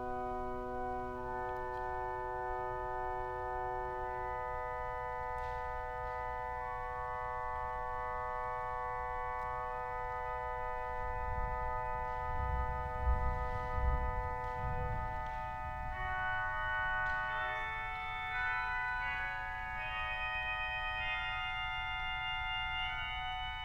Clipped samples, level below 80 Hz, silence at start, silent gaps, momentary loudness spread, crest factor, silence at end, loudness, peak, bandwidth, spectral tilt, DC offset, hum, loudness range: under 0.1%; -44 dBFS; 0 s; none; 4 LU; 16 dB; 0 s; -38 LUFS; -22 dBFS; 10.5 kHz; -6 dB/octave; under 0.1%; none; 3 LU